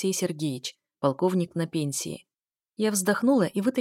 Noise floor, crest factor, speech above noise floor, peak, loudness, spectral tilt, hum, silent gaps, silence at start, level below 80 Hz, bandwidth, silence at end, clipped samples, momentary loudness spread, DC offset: -84 dBFS; 18 dB; 58 dB; -8 dBFS; -27 LUFS; -5 dB/octave; none; none; 0 s; -74 dBFS; 16.5 kHz; 0 s; under 0.1%; 13 LU; under 0.1%